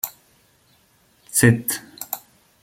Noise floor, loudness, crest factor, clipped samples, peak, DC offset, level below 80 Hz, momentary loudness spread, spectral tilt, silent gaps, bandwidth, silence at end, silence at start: -59 dBFS; -21 LUFS; 22 dB; under 0.1%; -2 dBFS; under 0.1%; -54 dBFS; 15 LU; -4.5 dB/octave; none; 16.5 kHz; 0.45 s; 0.05 s